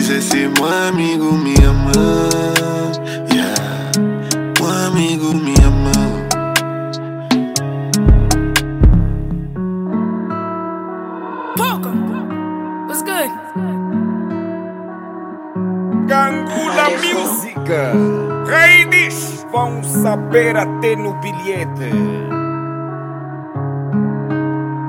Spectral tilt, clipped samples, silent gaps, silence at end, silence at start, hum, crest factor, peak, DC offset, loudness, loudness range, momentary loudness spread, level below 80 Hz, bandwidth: -5 dB/octave; under 0.1%; none; 0 s; 0 s; none; 16 dB; 0 dBFS; under 0.1%; -16 LUFS; 8 LU; 12 LU; -22 dBFS; 17 kHz